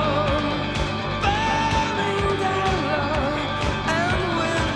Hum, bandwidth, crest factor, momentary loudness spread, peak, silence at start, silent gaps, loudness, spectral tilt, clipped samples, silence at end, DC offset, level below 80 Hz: none; 12 kHz; 14 dB; 3 LU; -8 dBFS; 0 s; none; -22 LUFS; -5 dB/octave; under 0.1%; 0 s; under 0.1%; -34 dBFS